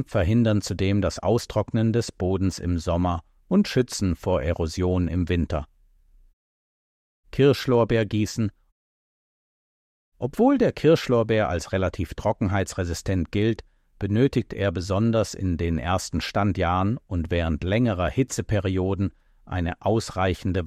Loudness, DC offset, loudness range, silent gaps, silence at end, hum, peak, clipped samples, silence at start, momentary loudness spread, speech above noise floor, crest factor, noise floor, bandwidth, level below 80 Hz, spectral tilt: -24 LUFS; under 0.1%; 2 LU; 6.33-7.23 s, 8.72-10.12 s; 0 s; none; -8 dBFS; under 0.1%; 0 s; 8 LU; 34 dB; 16 dB; -57 dBFS; 14 kHz; -40 dBFS; -6.5 dB/octave